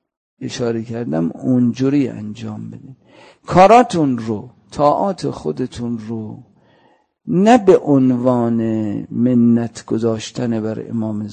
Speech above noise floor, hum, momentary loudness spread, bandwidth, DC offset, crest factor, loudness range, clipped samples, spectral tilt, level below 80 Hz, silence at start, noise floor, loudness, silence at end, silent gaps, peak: 40 dB; none; 17 LU; 9.2 kHz; under 0.1%; 16 dB; 6 LU; under 0.1%; -7 dB/octave; -50 dBFS; 0.4 s; -56 dBFS; -16 LUFS; 0 s; none; 0 dBFS